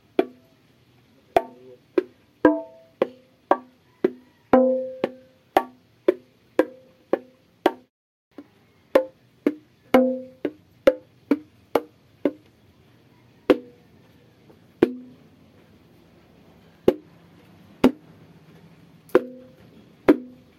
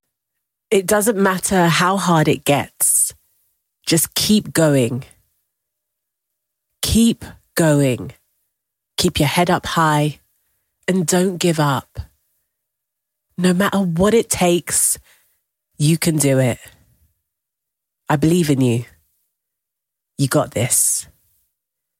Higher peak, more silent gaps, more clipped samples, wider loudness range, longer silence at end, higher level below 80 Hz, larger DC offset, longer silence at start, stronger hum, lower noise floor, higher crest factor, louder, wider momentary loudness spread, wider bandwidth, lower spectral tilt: about the same, -2 dBFS vs -4 dBFS; first, 7.90-8.31 s vs none; neither; about the same, 5 LU vs 5 LU; second, 0.3 s vs 0.95 s; second, -58 dBFS vs -44 dBFS; neither; second, 0.2 s vs 0.7 s; neither; second, -58 dBFS vs -82 dBFS; first, 26 dB vs 16 dB; second, -24 LUFS vs -17 LUFS; first, 16 LU vs 9 LU; about the same, 16 kHz vs 17 kHz; first, -6.5 dB/octave vs -4.5 dB/octave